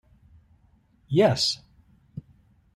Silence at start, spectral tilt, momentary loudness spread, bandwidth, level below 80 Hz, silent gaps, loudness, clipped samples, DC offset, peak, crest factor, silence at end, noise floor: 1.1 s; -5 dB/octave; 24 LU; 13 kHz; -60 dBFS; none; -23 LUFS; under 0.1%; under 0.1%; -8 dBFS; 20 dB; 0.55 s; -61 dBFS